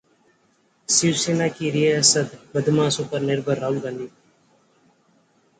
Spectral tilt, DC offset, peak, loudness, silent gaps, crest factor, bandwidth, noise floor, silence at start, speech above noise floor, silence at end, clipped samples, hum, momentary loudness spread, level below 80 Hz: -3.5 dB/octave; under 0.1%; -2 dBFS; -21 LUFS; none; 22 dB; 9.6 kHz; -63 dBFS; 0.9 s; 42 dB; 1.5 s; under 0.1%; none; 13 LU; -64 dBFS